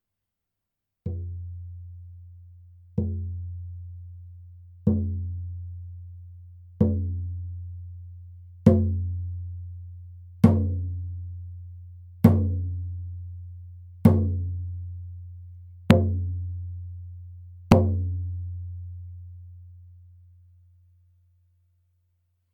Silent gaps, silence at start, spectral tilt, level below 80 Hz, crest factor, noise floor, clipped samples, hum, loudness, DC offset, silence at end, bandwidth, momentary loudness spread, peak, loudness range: none; 1.05 s; -9 dB/octave; -44 dBFS; 26 dB; -84 dBFS; under 0.1%; none; -26 LUFS; under 0.1%; 2.45 s; 6.6 kHz; 25 LU; 0 dBFS; 11 LU